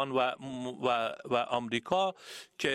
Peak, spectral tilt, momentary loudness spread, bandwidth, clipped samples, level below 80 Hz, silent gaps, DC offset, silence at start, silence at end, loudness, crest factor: -14 dBFS; -4.5 dB/octave; 9 LU; 15.5 kHz; under 0.1%; -70 dBFS; none; under 0.1%; 0 s; 0 s; -32 LUFS; 20 dB